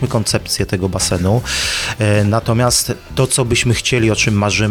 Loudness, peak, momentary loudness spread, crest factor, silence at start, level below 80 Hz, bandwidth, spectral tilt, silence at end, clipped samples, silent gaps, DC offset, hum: -15 LUFS; -2 dBFS; 4 LU; 14 dB; 0 s; -34 dBFS; 18.5 kHz; -4 dB/octave; 0 s; under 0.1%; none; under 0.1%; none